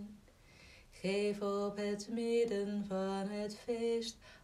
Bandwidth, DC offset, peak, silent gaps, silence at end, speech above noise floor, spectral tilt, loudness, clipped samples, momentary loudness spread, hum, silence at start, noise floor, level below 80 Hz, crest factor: 14 kHz; under 0.1%; -24 dBFS; none; 0.05 s; 24 dB; -5.5 dB/octave; -37 LUFS; under 0.1%; 8 LU; none; 0 s; -61 dBFS; -68 dBFS; 14 dB